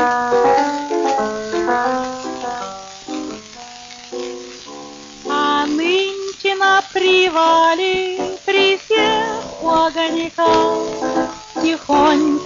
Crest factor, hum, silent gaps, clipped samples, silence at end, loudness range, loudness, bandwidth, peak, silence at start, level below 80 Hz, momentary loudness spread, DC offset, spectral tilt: 12 dB; none; none; under 0.1%; 0 s; 9 LU; -17 LUFS; 7.6 kHz; -4 dBFS; 0 s; -50 dBFS; 18 LU; under 0.1%; -1 dB/octave